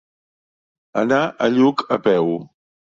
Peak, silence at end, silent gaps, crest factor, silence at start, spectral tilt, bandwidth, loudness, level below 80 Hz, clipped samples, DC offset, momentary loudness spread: -4 dBFS; 0.4 s; none; 16 dB; 0.95 s; -6.5 dB/octave; 7.4 kHz; -19 LUFS; -62 dBFS; under 0.1%; under 0.1%; 8 LU